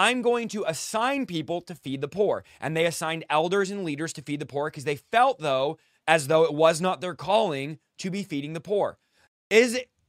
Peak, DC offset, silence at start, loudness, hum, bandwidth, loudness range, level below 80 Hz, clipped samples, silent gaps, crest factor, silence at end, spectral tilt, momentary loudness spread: -2 dBFS; under 0.1%; 0 s; -26 LUFS; none; 16 kHz; 4 LU; -70 dBFS; under 0.1%; 9.28-9.50 s; 22 dB; 0.25 s; -4 dB/octave; 12 LU